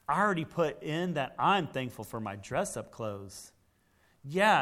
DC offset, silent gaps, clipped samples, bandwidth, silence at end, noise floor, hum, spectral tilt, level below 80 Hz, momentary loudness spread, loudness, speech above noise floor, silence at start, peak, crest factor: under 0.1%; none; under 0.1%; 16 kHz; 0 s; -68 dBFS; none; -5 dB/octave; -64 dBFS; 13 LU; -32 LUFS; 38 dB; 0.1 s; -10 dBFS; 20 dB